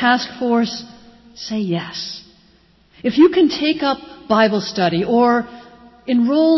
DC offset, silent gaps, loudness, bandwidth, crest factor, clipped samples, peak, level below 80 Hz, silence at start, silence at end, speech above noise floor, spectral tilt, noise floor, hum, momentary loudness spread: under 0.1%; none; -17 LUFS; 6.2 kHz; 14 dB; under 0.1%; -4 dBFS; -56 dBFS; 0 s; 0 s; 37 dB; -5.5 dB/octave; -53 dBFS; none; 15 LU